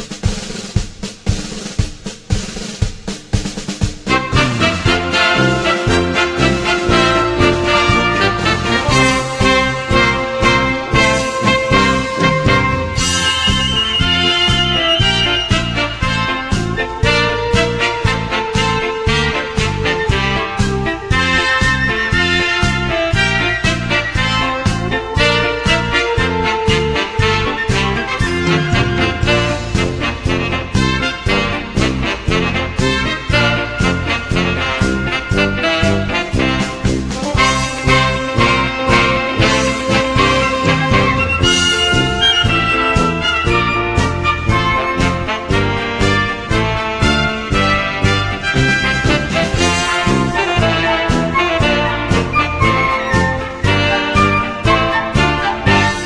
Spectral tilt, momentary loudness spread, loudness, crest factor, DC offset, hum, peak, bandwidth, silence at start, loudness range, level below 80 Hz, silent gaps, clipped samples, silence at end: -4.5 dB/octave; 6 LU; -14 LUFS; 14 dB; under 0.1%; none; 0 dBFS; 11 kHz; 0 s; 3 LU; -26 dBFS; none; under 0.1%; 0 s